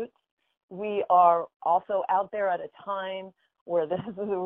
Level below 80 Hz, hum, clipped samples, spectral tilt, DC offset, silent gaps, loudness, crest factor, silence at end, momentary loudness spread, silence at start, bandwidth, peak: -74 dBFS; none; under 0.1%; -9 dB/octave; under 0.1%; 0.31-0.37 s, 0.63-0.68 s, 1.56-1.60 s, 3.61-3.66 s; -27 LUFS; 20 dB; 0 s; 16 LU; 0 s; 3.8 kHz; -8 dBFS